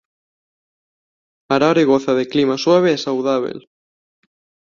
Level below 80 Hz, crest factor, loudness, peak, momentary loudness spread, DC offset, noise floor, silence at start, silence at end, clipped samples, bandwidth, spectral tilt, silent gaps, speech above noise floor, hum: -62 dBFS; 18 dB; -16 LUFS; -2 dBFS; 7 LU; under 0.1%; under -90 dBFS; 1.5 s; 1.1 s; under 0.1%; 7.4 kHz; -5.5 dB/octave; none; over 74 dB; none